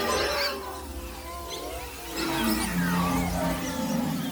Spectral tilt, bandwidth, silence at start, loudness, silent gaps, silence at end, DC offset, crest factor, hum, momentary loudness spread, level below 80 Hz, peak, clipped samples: -4.5 dB/octave; over 20 kHz; 0 s; -29 LUFS; none; 0 s; under 0.1%; 16 dB; none; 12 LU; -42 dBFS; -14 dBFS; under 0.1%